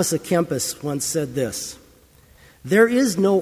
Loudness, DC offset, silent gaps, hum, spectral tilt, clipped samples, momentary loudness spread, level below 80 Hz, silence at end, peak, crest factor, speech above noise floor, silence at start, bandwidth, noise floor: -21 LUFS; under 0.1%; none; none; -4.5 dB/octave; under 0.1%; 12 LU; -54 dBFS; 0 s; -2 dBFS; 18 dB; 32 dB; 0 s; 16 kHz; -52 dBFS